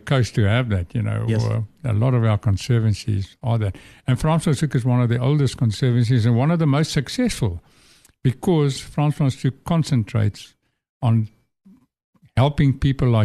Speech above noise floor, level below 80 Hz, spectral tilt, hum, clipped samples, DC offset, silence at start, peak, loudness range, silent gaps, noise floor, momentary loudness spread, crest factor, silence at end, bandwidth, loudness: 34 dB; -42 dBFS; -7 dB/octave; none; under 0.1%; under 0.1%; 0.05 s; -4 dBFS; 4 LU; 10.89-11.00 s, 12.04-12.13 s; -53 dBFS; 7 LU; 16 dB; 0 s; 12.5 kHz; -21 LUFS